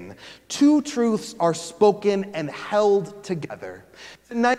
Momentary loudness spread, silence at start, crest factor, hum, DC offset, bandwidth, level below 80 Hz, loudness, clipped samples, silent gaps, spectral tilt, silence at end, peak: 22 LU; 0 s; 18 dB; none; under 0.1%; 13 kHz; -66 dBFS; -22 LUFS; under 0.1%; none; -5 dB/octave; 0 s; -6 dBFS